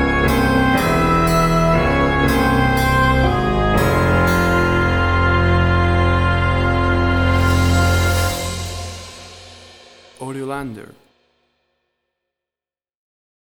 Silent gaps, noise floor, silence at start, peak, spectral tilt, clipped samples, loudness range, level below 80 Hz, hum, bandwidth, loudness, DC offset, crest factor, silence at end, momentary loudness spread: none; under -90 dBFS; 0 s; -2 dBFS; -6 dB/octave; under 0.1%; 18 LU; -26 dBFS; none; over 20 kHz; -16 LUFS; under 0.1%; 14 dB; 2.6 s; 13 LU